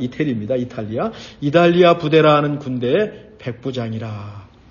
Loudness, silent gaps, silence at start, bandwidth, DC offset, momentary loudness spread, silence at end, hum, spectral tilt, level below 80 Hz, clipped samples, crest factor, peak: -18 LUFS; none; 0 s; 7.2 kHz; under 0.1%; 17 LU; 0.25 s; none; -7.5 dB/octave; -52 dBFS; under 0.1%; 18 dB; 0 dBFS